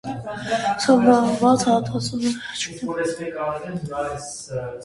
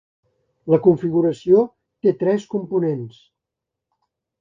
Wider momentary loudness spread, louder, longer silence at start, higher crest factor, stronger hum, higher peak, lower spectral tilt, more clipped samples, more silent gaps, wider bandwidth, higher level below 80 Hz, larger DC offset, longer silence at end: about the same, 14 LU vs 12 LU; second, -22 LUFS vs -19 LUFS; second, 0.05 s vs 0.65 s; about the same, 18 dB vs 18 dB; neither; about the same, -4 dBFS vs -2 dBFS; second, -5 dB/octave vs -9 dB/octave; neither; neither; first, 11.5 kHz vs 7.4 kHz; first, -54 dBFS vs -62 dBFS; neither; second, 0 s vs 1.3 s